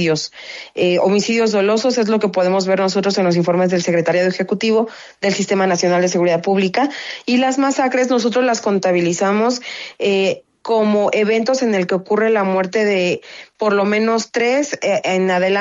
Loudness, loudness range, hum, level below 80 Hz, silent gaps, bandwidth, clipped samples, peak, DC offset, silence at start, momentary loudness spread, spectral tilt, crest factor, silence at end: -16 LUFS; 1 LU; none; -64 dBFS; none; 7.8 kHz; under 0.1%; -4 dBFS; under 0.1%; 0 s; 5 LU; -5 dB/octave; 12 dB; 0 s